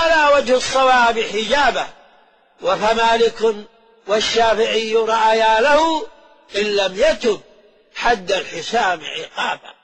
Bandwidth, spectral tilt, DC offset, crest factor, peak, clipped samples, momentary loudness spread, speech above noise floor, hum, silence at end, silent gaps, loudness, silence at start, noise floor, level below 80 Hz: 9.2 kHz; -2 dB/octave; under 0.1%; 14 dB; -4 dBFS; under 0.1%; 11 LU; 36 dB; none; 0.15 s; none; -17 LUFS; 0 s; -53 dBFS; -46 dBFS